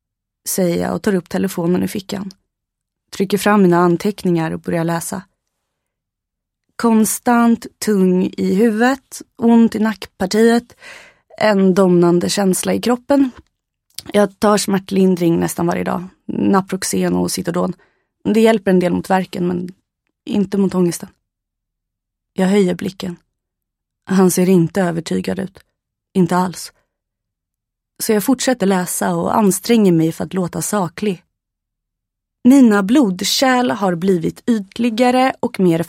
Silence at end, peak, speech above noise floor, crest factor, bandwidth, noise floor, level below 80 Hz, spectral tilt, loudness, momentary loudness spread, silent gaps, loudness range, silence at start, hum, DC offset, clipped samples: 0 s; 0 dBFS; 65 dB; 16 dB; 16.5 kHz; -80 dBFS; -54 dBFS; -5.5 dB/octave; -16 LUFS; 12 LU; none; 5 LU; 0.45 s; none; under 0.1%; under 0.1%